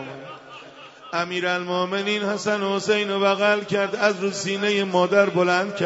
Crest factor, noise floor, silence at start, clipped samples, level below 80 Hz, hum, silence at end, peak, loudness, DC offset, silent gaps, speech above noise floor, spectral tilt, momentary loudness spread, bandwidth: 18 dB; -43 dBFS; 0 s; under 0.1%; -72 dBFS; none; 0 s; -4 dBFS; -22 LUFS; under 0.1%; none; 21 dB; -4.5 dB/octave; 20 LU; 8 kHz